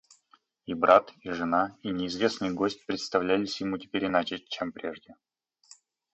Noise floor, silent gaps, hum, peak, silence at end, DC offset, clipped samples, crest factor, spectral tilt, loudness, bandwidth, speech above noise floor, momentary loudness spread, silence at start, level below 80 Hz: -65 dBFS; none; none; -6 dBFS; 1 s; under 0.1%; under 0.1%; 24 dB; -5 dB/octave; -28 LUFS; 8.4 kHz; 37 dB; 16 LU; 0.7 s; -64 dBFS